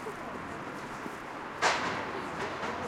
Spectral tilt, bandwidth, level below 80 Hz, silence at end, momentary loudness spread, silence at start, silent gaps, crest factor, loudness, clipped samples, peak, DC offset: -3 dB/octave; 16.5 kHz; -62 dBFS; 0 s; 11 LU; 0 s; none; 22 dB; -34 LUFS; under 0.1%; -12 dBFS; under 0.1%